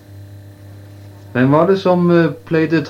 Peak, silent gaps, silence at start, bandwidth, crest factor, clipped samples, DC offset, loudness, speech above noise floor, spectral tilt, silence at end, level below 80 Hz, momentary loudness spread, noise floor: 0 dBFS; none; 0.1 s; 7 kHz; 16 dB; under 0.1%; under 0.1%; -14 LUFS; 24 dB; -8.5 dB/octave; 0 s; -60 dBFS; 5 LU; -37 dBFS